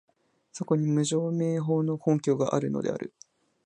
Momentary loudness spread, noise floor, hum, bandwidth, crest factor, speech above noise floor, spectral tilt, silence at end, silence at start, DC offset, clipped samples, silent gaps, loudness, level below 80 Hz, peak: 12 LU; -52 dBFS; none; 10.5 kHz; 18 dB; 25 dB; -7 dB/octave; 0.6 s; 0.55 s; under 0.1%; under 0.1%; none; -27 LUFS; -70 dBFS; -10 dBFS